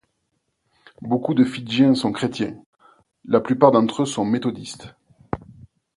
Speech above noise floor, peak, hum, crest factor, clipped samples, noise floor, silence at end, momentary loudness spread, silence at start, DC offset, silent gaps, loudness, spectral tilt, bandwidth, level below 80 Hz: 53 dB; 0 dBFS; none; 22 dB; under 0.1%; -73 dBFS; 0.45 s; 17 LU; 1 s; under 0.1%; 2.66-2.73 s; -20 LUFS; -6 dB/octave; 11.5 kHz; -54 dBFS